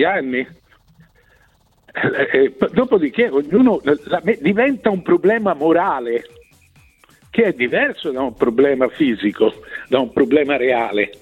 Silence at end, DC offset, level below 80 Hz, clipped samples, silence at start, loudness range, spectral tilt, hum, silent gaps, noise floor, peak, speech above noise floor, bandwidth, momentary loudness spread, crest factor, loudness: 0.1 s; under 0.1%; -54 dBFS; under 0.1%; 0 s; 3 LU; -7.5 dB/octave; none; none; -56 dBFS; -2 dBFS; 40 dB; 9 kHz; 8 LU; 16 dB; -17 LUFS